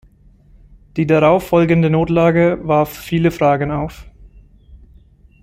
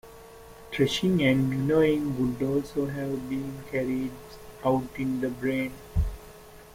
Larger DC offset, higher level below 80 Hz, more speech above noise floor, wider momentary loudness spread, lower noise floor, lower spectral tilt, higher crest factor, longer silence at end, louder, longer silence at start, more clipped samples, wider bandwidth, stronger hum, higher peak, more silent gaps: neither; about the same, -40 dBFS vs -42 dBFS; first, 33 dB vs 21 dB; second, 9 LU vs 23 LU; about the same, -48 dBFS vs -48 dBFS; first, -8 dB/octave vs -6.5 dB/octave; about the same, 16 dB vs 18 dB; first, 0.65 s vs 0 s; first, -15 LUFS vs -28 LUFS; first, 0.95 s vs 0.05 s; neither; about the same, 16 kHz vs 16.5 kHz; neither; first, -2 dBFS vs -10 dBFS; neither